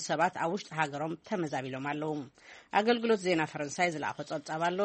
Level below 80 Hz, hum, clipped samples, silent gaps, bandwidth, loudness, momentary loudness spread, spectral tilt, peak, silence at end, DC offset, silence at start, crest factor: -74 dBFS; none; under 0.1%; none; 8.4 kHz; -32 LUFS; 9 LU; -4.5 dB/octave; -12 dBFS; 0 s; under 0.1%; 0 s; 20 dB